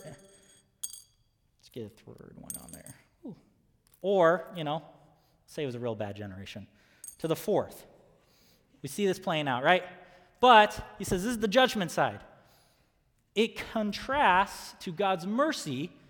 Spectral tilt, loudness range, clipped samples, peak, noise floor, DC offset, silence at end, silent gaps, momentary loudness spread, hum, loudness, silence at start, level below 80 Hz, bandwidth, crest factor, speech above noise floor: -4 dB/octave; 12 LU; under 0.1%; -6 dBFS; -71 dBFS; under 0.1%; 0.2 s; none; 23 LU; none; -28 LUFS; 0 s; -60 dBFS; 19.5 kHz; 24 dB; 42 dB